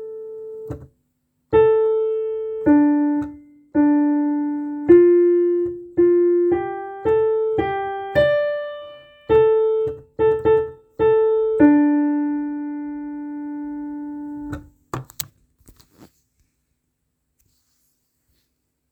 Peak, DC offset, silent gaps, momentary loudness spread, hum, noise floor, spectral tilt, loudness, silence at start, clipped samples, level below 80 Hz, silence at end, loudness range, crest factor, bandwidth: -2 dBFS; under 0.1%; none; 18 LU; none; -73 dBFS; -7 dB/octave; -19 LUFS; 0 s; under 0.1%; -50 dBFS; 3.7 s; 16 LU; 18 dB; 19.5 kHz